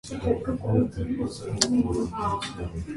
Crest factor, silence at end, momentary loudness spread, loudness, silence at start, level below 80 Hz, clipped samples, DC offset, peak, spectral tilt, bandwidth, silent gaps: 26 dB; 0 s; 8 LU; -27 LUFS; 0.05 s; -42 dBFS; under 0.1%; under 0.1%; -2 dBFS; -5 dB/octave; 11.5 kHz; none